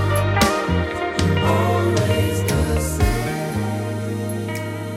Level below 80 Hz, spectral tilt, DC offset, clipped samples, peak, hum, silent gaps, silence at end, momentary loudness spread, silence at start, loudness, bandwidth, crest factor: -32 dBFS; -5.5 dB/octave; under 0.1%; under 0.1%; 0 dBFS; none; none; 0 s; 7 LU; 0 s; -20 LUFS; 16.5 kHz; 18 dB